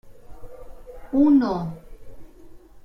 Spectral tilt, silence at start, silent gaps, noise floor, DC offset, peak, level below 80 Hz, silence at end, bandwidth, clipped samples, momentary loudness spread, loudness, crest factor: -9 dB/octave; 0.05 s; none; -44 dBFS; under 0.1%; -8 dBFS; -46 dBFS; 0.05 s; 6 kHz; under 0.1%; 26 LU; -21 LUFS; 16 dB